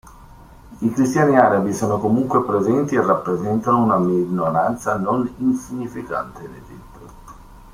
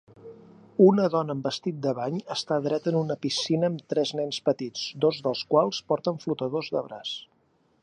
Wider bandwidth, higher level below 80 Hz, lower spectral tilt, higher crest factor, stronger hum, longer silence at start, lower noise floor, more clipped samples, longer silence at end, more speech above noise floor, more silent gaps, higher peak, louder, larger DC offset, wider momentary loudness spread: first, 15.5 kHz vs 10.5 kHz; first, -48 dBFS vs -74 dBFS; first, -7.5 dB/octave vs -6 dB/octave; about the same, 20 dB vs 20 dB; neither; second, 0.05 s vs 0.25 s; second, -43 dBFS vs -66 dBFS; neither; second, 0.05 s vs 0.6 s; second, 25 dB vs 41 dB; neither; first, 0 dBFS vs -6 dBFS; first, -19 LUFS vs -26 LUFS; neither; about the same, 12 LU vs 10 LU